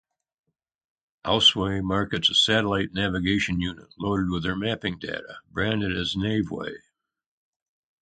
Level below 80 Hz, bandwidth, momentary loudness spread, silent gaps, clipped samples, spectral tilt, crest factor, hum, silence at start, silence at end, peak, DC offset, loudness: -48 dBFS; 9.4 kHz; 15 LU; none; under 0.1%; -4.5 dB/octave; 22 dB; none; 1.25 s; 1.25 s; -4 dBFS; under 0.1%; -24 LUFS